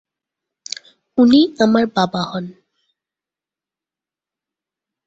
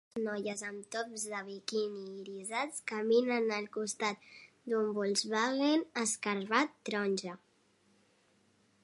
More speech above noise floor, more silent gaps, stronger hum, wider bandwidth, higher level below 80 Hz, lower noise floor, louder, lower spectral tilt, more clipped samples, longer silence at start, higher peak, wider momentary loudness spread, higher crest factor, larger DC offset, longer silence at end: first, 74 dB vs 36 dB; neither; neither; second, 7.8 kHz vs 11.5 kHz; first, -60 dBFS vs -86 dBFS; first, -89 dBFS vs -70 dBFS; first, -15 LUFS vs -34 LUFS; first, -5.5 dB/octave vs -3 dB/octave; neither; first, 1.15 s vs 0.15 s; first, -2 dBFS vs -14 dBFS; first, 18 LU vs 12 LU; about the same, 18 dB vs 22 dB; neither; first, 2.55 s vs 1.45 s